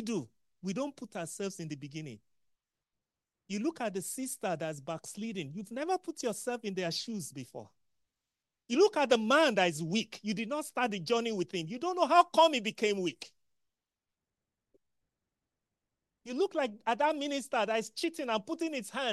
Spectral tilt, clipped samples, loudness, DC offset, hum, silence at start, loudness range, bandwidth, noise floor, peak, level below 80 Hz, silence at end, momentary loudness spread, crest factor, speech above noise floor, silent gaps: -4 dB/octave; under 0.1%; -32 LUFS; under 0.1%; none; 0 s; 11 LU; 12.5 kHz; under -90 dBFS; -10 dBFS; -82 dBFS; 0 s; 16 LU; 24 dB; over 58 dB; none